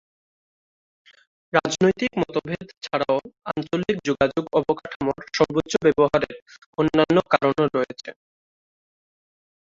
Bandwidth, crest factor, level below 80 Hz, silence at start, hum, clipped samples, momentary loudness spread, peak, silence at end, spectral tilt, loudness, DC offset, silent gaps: 7.8 kHz; 20 dB; -54 dBFS; 1.55 s; none; under 0.1%; 12 LU; -2 dBFS; 1.5 s; -5.5 dB/octave; -23 LUFS; under 0.1%; 2.77-2.81 s, 4.96-5.00 s, 6.42-6.46 s, 6.66-6.73 s